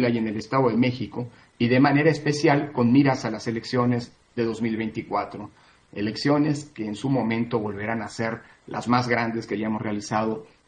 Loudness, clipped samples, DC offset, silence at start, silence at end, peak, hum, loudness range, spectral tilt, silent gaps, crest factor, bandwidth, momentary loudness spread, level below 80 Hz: -24 LUFS; under 0.1%; under 0.1%; 0 s; 0.25 s; -4 dBFS; none; 5 LU; -6.5 dB/octave; none; 20 dB; 9.8 kHz; 13 LU; -62 dBFS